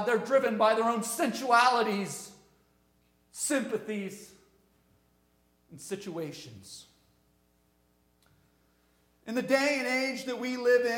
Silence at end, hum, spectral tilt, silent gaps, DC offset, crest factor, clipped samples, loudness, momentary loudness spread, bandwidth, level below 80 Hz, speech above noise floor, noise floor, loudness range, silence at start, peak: 0 s; 60 Hz at -70 dBFS; -3.5 dB/octave; none; under 0.1%; 22 dB; under 0.1%; -29 LUFS; 22 LU; 17 kHz; -74 dBFS; 40 dB; -69 dBFS; 16 LU; 0 s; -10 dBFS